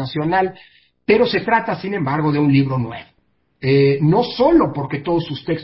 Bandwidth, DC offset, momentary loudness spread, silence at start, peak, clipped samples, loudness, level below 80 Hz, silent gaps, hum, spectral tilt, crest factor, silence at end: 5.8 kHz; under 0.1%; 10 LU; 0 s; -2 dBFS; under 0.1%; -17 LUFS; -48 dBFS; none; none; -11.5 dB/octave; 16 dB; 0 s